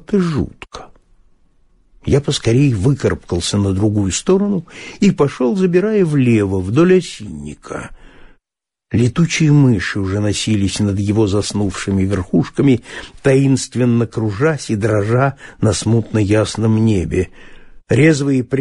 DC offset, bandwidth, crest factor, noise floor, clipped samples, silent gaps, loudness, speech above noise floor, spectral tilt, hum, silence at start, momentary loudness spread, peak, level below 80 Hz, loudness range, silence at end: under 0.1%; 11.5 kHz; 14 dB; -86 dBFS; under 0.1%; none; -16 LUFS; 71 dB; -6 dB/octave; none; 0.1 s; 13 LU; -2 dBFS; -40 dBFS; 2 LU; 0 s